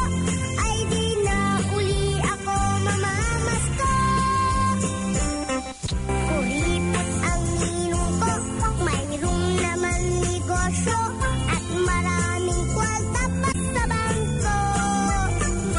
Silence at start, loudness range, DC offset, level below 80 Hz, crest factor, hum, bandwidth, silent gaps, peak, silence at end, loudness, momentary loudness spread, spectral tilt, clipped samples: 0 s; 1 LU; under 0.1%; -32 dBFS; 12 dB; none; 11 kHz; none; -12 dBFS; 0 s; -23 LUFS; 3 LU; -4.5 dB/octave; under 0.1%